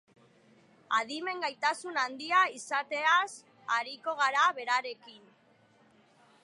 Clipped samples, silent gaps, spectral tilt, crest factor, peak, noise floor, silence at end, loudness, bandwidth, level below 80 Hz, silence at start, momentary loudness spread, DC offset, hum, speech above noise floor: under 0.1%; none; -0.5 dB/octave; 18 dB; -14 dBFS; -64 dBFS; 1.25 s; -30 LUFS; 11.5 kHz; under -90 dBFS; 0.9 s; 10 LU; under 0.1%; none; 34 dB